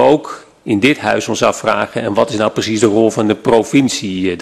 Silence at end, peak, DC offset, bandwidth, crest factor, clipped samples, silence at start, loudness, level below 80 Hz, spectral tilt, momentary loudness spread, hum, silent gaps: 0 s; 0 dBFS; under 0.1%; 13 kHz; 14 dB; under 0.1%; 0 s; -14 LUFS; -50 dBFS; -4.5 dB/octave; 6 LU; none; none